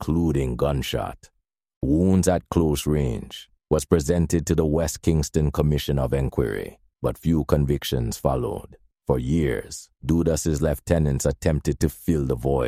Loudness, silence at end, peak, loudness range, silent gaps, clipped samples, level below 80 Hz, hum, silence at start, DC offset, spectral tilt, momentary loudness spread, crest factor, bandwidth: -23 LUFS; 0 s; -2 dBFS; 2 LU; 1.76-1.81 s; under 0.1%; -34 dBFS; none; 0 s; under 0.1%; -6.5 dB/octave; 9 LU; 20 dB; 16 kHz